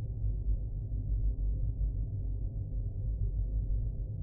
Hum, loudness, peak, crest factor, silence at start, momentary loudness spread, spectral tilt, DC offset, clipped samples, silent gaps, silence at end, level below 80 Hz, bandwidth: none; -37 LUFS; -22 dBFS; 10 dB; 0 s; 3 LU; -16 dB/octave; under 0.1%; under 0.1%; none; 0 s; -34 dBFS; 0.9 kHz